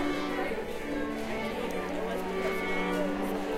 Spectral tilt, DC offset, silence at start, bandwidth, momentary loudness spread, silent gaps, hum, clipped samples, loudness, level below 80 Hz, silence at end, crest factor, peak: -5.5 dB/octave; under 0.1%; 0 s; 16 kHz; 4 LU; none; none; under 0.1%; -32 LUFS; -48 dBFS; 0 s; 14 dB; -18 dBFS